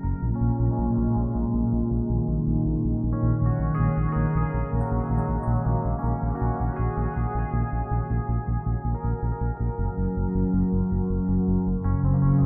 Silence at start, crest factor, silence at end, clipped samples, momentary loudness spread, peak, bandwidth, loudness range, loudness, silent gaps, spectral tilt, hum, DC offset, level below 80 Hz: 0 s; 12 dB; 0 s; under 0.1%; 4 LU; -10 dBFS; 2.6 kHz; 3 LU; -25 LUFS; none; -13.5 dB/octave; none; under 0.1%; -30 dBFS